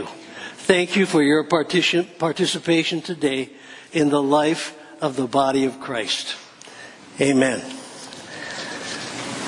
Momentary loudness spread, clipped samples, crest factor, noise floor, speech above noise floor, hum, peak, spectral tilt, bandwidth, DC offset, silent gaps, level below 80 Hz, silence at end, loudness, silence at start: 18 LU; under 0.1%; 22 dB; -42 dBFS; 21 dB; none; 0 dBFS; -4 dB/octave; 11 kHz; under 0.1%; none; -64 dBFS; 0 s; -21 LUFS; 0 s